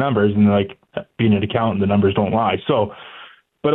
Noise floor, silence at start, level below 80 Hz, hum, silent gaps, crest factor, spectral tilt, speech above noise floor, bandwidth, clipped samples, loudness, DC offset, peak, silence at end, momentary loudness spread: -43 dBFS; 0 s; -52 dBFS; none; none; 14 dB; -11 dB/octave; 26 dB; 4 kHz; under 0.1%; -18 LUFS; under 0.1%; -4 dBFS; 0 s; 15 LU